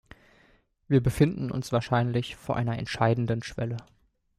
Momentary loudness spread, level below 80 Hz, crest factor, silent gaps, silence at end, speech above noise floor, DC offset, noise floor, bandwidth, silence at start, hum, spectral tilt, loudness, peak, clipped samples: 8 LU; -50 dBFS; 20 dB; none; 0.55 s; 37 dB; under 0.1%; -63 dBFS; 14.5 kHz; 0.9 s; none; -7 dB/octave; -27 LUFS; -8 dBFS; under 0.1%